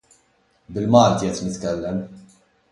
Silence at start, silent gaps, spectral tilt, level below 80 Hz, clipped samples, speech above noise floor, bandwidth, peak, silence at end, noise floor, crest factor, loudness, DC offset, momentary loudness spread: 0.7 s; none; -6 dB/octave; -50 dBFS; under 0.1%; 43 dB; 11.5 kHz; -2 dBFS; 0.5 s; -62 dBFS; 20 dB; -20 LUFS; under 0.1%; 16 LU